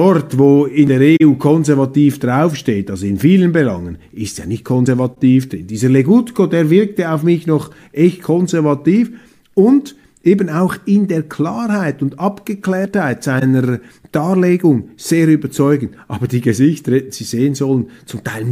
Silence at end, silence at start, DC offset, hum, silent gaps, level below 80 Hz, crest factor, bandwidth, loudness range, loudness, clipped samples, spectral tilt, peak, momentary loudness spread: 0 s; 0 s; under 0.1%; none; none; -50 dBFS; 14 dB; 15.5 kHz; 4 LU; -14 LUFS; under 0.1%; -7.5 dB/octave; 0 dBFS; 11 LU